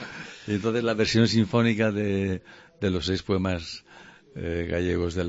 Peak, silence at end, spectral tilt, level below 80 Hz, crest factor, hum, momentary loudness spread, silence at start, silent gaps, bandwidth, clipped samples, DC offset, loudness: -8 dBFS; 0 s; -6 dB/octave; -48 dBFS; 18 dB; none; 15 LU; 0 s; none; 8 kHz; under 0.1%; under 0.1%; -26 LUFS